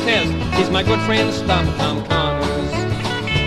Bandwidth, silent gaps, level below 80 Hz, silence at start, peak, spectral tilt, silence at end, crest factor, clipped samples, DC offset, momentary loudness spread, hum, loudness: 13 kHz; none; -30 dBFS; 0 s; -2 dBFS; -5.5 dB/octave; 0 s; 16 dB; under 0.1%; under 0.1%; 5 LU; none; -18 LUFS